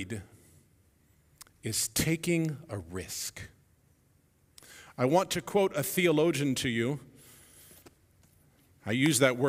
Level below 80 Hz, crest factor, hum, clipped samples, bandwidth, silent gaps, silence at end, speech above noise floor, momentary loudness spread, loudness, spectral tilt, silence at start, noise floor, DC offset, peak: -60 dBFS; 22 dB; none; under 0.1%; 16 kHz; none; 0 s; 38 dB; 18 LU; -29 LUFS; -4.5 dB/octave; 0 s; -67 dBFS; under 0.1%; -10 dBFS